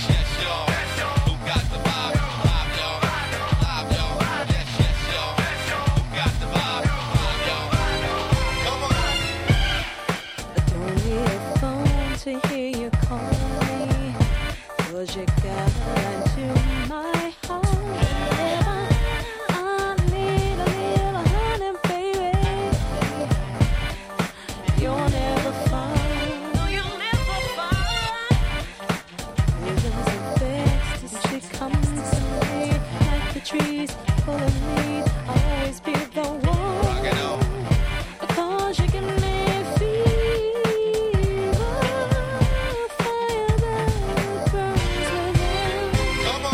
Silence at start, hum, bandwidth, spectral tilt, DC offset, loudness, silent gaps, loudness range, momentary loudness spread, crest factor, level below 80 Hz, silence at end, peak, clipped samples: 0 s; none; 16 kHz; -5.5 dB/octave; under 0.1%; -23 LUFS; none; 2 LU; 4 LU; 18 dB; -28 dBFS; 0 s; -4 dBFS; under 0.1%